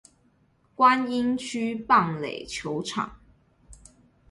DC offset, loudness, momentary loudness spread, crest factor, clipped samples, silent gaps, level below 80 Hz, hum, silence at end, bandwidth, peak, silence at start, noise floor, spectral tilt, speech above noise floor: under 0.1%; -25 LUFS; 12 LU; 22 dB; under 0.1%; none; -58 dBFS; none; 0.55 s; 11.5 kHz; -6 dBFS; 0.8 s; -64 dBFS; -4.5 dB/octave; 40 dB